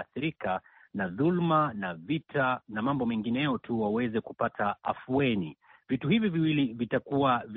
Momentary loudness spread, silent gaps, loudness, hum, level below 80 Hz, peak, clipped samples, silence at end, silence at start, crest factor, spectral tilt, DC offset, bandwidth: 8 LU; none; -29 LUFS; none; -64 dBFS; -14 dBFS; under 0.1%; 0 s; 0 s; 16 dB; -5 dB/octave; under 0.1%; 4.2 kHz